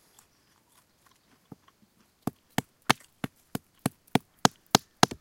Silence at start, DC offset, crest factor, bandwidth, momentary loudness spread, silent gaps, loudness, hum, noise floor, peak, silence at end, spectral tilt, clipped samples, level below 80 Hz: 2.25 s; under 0.1%; 32 dB; 17 kHz; 16 LU; none; -30 LUFS; none; -66 dBFS; 0 dBFS; 0.15 s; -3.5 dB/octave; under 0.1%; -62 dBFS